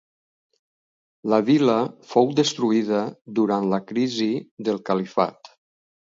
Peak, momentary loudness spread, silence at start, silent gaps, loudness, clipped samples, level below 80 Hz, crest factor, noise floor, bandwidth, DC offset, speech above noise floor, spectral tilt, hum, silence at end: -4 dBFS; 8 LU; 1.25 s; 4.51-4.57 s; -22 LUFS; under 0.1%; -70 dBFS; 20 dB; under -90 dBFS; 7.8 kHz; under 0.1%; over 68 dB; -5.5 dB/octave; none; 0.8 s